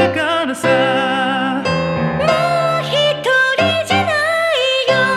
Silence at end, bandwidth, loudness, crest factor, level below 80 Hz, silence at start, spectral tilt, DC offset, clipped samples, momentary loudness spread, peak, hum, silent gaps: 0 s; 14.5 kHz; -15 LUFS; 16 dB; -52 dBFS; 0 s; -4.5 dB/octave; under 0.1%; under 0.1%; 4 LU; 0 dBFS; none; none